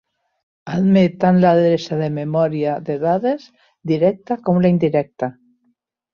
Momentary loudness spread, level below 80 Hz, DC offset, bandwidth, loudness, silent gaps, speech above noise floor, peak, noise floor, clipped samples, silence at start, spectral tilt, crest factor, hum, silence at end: 12 LU; -58 dBFS; under 0.1%; 6.8 kHz; -18 LUFS; none; 49 dB; -2 dBFS; -66 dBFS; under 0.1%; 0.65 s; -8.5 dB/octave; 16 dB; none; 0.85 s